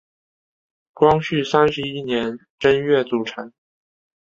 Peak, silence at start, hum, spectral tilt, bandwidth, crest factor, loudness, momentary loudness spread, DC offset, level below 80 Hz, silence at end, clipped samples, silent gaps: -2 dBFS; 1 s; none; -6 dB/octave; 7.4 kHz; 20 dB; -19 LUFS; 12 LU; under 0.1%; -52 dBFS; 0.75 s; under 0.1%; 2.50-2.58 s